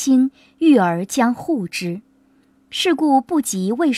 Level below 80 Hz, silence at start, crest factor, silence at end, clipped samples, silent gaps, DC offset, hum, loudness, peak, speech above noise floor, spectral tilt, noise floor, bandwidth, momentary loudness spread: -66 dBFS; 0 s; 14 dB; 0 s; under 0.1%; none; under 0.1%; none; -18 LUFS; -4 dBFS; 39 dB; -4.5 dB/octave; -56 dBFS; 14.5 kHz; 11 LU